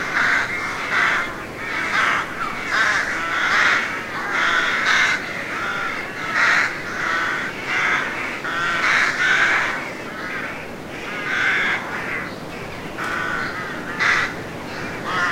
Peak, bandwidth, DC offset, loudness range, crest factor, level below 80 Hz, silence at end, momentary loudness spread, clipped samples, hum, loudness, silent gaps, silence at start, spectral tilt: -4 dBFS; 16 kHz; 0.2%; 5 LU; 18 dB; -48 dBFS; 0 s; 12 LU; under 0.1%; none; -20 LUFS; none; 0 s; -2.5 dB/octave